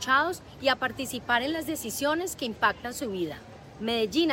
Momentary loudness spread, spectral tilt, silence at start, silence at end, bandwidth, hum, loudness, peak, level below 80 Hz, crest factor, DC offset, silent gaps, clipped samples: 9 LU; -3 dB/octave; 0 s; 0 s; 16.5 kHz; none; -28 LUFS; -10 dBFS; -56 dBFS; 18 dB; under 0.1%; none; under 0.1%